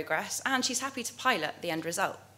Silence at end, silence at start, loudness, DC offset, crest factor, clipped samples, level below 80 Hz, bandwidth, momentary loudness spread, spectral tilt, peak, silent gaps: 0.1 s; 0 s; -30 LUFS; under 0.1%; 22 dB; under 0.1%; -78 dBFS; 16 kHz; 5 LU; -2 dB/octave; -10 dBFS; none